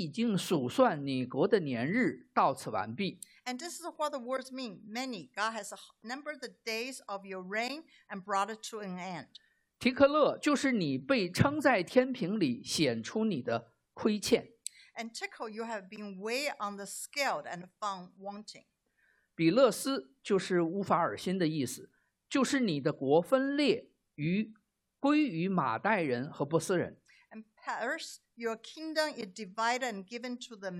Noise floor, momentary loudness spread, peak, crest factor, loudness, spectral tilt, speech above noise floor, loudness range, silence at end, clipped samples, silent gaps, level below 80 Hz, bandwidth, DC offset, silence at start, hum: -73 dBFS; 15 LU; -12 dBFS; 22 dB; -32 LUFS; -5 dB/octave; 41 dB; 8 LU; 0 s; under 0.1%; none; -72 dBFS; 15 kHz; under 0.1%; 0 s; none